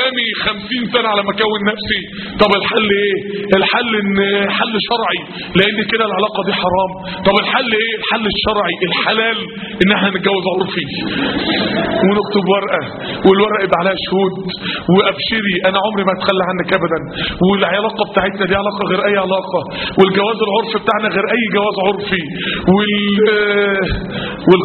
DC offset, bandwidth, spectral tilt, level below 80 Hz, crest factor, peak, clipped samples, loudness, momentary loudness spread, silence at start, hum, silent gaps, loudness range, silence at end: under 0.1%; 4.6 kHz; -3 dB/octave; -40 dBFS; 14 dB; 0 dBFS; under 0.1%; -15 LUFS; 6 LU; 0 s; none; none; 1 LU; 0 s